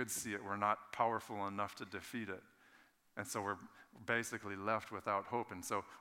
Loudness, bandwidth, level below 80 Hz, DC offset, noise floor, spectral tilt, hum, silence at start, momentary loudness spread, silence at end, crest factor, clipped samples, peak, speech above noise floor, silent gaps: -41 LUFS; 18 kHz; -82 dBFS; under 0.1%; -69 dBFS; -3.5 dB/octave; none; 0 s; 11 LU; 0 s; 22 dB; under 0.1%; -20 dBFS; 27 dB; none